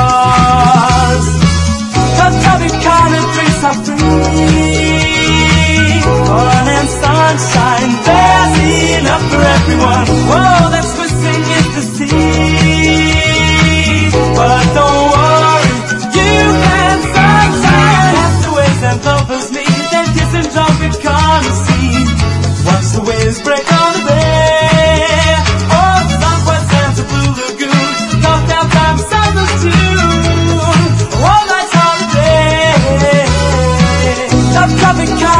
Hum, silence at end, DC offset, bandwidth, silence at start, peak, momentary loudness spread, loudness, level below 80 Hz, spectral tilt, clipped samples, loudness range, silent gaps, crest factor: none; 0 s; under 0.1%; 11.5 kHz; 0 s; 0 dBFS; 5 LU; -9 LUFS; -22 dBFS; -5 dB/octave; 0.2%; 2 LU; none; 8 dB